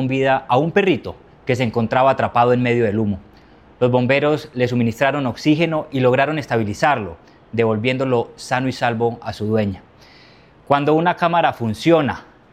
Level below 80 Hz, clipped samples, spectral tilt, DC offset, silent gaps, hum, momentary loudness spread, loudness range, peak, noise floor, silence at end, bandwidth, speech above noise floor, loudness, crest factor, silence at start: -54 dBFS; under 0.1%; -7 dB/octave; under 0.1%; none; none; 8 LU; 3 LU; 0 dBFS; -47 dBFS; 0.3 s; 14.5 kHz; 30 dB; -18 LUFS; 18 dB; 0 s